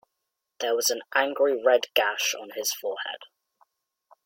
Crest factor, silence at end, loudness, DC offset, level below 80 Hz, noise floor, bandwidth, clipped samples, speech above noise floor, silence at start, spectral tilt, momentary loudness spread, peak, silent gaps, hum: 20 dB; 1 s; -25 LUFS; under 0.1%; -80 dBFS; -82 dBFS; 17 kHz; under 0.1%; 57 dB; 0.6 s; 1 dB/octave; 11 LU; -8 dBFS; none; none